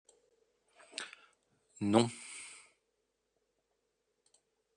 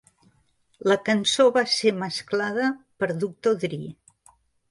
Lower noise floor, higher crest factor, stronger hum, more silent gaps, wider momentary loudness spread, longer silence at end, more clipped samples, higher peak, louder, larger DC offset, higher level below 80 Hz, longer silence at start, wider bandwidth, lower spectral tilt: first, -82 dBFS vs -65 dBFS; first, 30 dB vs 18 dB; neither; neither; first, 20 LU vs 11 LU; first, 2.25 s vs 0.8 s; neither; second, -12 dBFS vs -6 dBFS; second, -35 LUFS vs -23 LUFS; neither; second, -82 dBFS vs -68 dBFS; about the same, 0.95 s vs 0.85 s; second, 10 kHz vs 11.5 kHz; about the same, -5 dB/octave vs -4 dB/octave